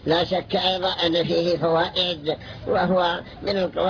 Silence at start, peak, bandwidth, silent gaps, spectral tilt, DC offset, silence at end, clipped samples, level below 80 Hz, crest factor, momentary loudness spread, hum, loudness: 0 s; -6 dBFS; 5.4 kHz; none; -6 dB/octave; under 0.1%; 0 s; under 0.1%; -50 dBFS; 16 dB; 7 LU; none; -22 LUFS